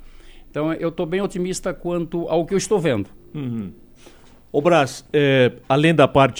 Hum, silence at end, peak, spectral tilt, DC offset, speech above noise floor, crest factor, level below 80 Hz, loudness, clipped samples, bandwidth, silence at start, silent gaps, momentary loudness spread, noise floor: none; 0 s; -2 dBFS; -5.5 dB/octave; under 0.1%; 27 dB; 20 dB; -46 dBFS; -20 LUFS; under 0.1%; over 20 kHz; 0 s; none; 13 LU; -46 dBFS